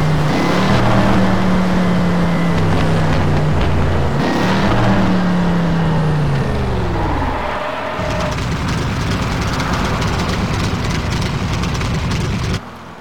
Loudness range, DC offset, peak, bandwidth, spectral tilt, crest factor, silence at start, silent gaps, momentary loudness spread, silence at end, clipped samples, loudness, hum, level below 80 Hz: 4 LU; 5%; -4 dBFS; 16.5 kHz; -6.5 dB/octave; 12 dB; 0 s; none; 5 LU; 0 s; under 0.1%; -17 LUFS; none; -26 dBFS